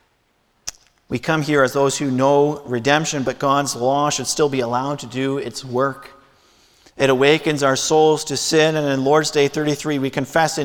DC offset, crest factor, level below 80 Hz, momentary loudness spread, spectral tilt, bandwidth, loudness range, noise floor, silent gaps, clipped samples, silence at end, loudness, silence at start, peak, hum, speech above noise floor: under 0.1%; 18 dB; -54 dBFS; 9 LU; -4 dB/octave; 18 kHz; 4 LU; -63 dBFS; none; under 0.1%; 0 s; -18 LUFS; 0.65 s; -2 dBFS; none; 45 dB